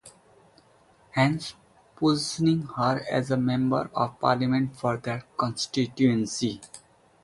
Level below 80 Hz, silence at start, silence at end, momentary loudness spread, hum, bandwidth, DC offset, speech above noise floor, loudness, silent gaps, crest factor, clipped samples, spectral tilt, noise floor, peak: -60 dBFS; 0.05 s; 0.45 s; 8 LU; none; 11.5 kHz; under 0.1%; 34 dB; -26 LUFS; none; 20 dB; under 0.1%; -5.5 dB/octave; -59 dBFS; -6 dBFS